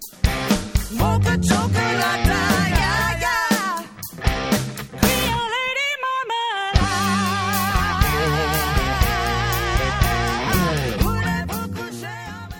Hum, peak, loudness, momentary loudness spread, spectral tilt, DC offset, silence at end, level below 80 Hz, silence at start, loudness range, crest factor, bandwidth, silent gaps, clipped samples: none; 0 dBFS; -20 LUFS; 7 LU; -4.5 dB/octave; under 0.1%; 0 s; -28 dBFS; 0 s; 2 LU; 20 dB; 19.5 kHz; none; under 0.1%